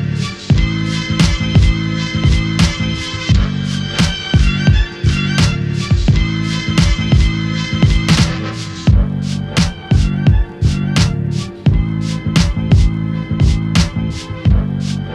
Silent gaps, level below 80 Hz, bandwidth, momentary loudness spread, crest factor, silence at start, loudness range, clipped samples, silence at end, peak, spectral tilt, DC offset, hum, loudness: none; -20 dBFS; 12 kHz; 6 LU; 12 dB; 0 s; 1 LU; under 0.1%; 0 s; 0 dBFS; -5.5 dB/octave; under 0.1%; none; -15 LUFS